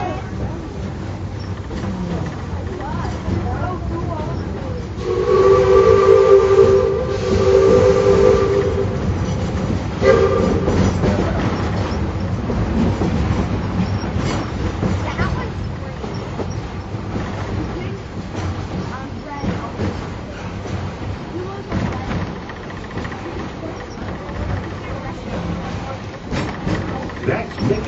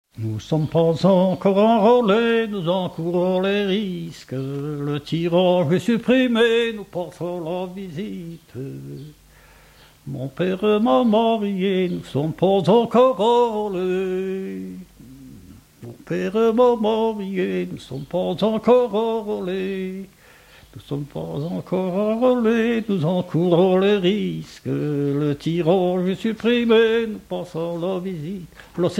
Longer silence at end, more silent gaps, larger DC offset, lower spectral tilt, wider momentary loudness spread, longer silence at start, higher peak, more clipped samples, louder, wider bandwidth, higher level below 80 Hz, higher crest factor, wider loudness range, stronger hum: about the same, 0 s vs 0 s; neither; neither; about the same, -6.5 dB/octave vs -7 dB/octave; about the same, 15 LU vs 15 LU; second, 0 s vs 0.15 s; first, 0 dBFS vs -4 dBFS; neither; about the same, -19 LUFS vs -20 LUFS; second, 8 kHz vs 16 kHz; first, -30 dBFS vs -54 dBFS; about the same, 18 dB vs 16 dB; first, 13 LU vs 6 LU; neither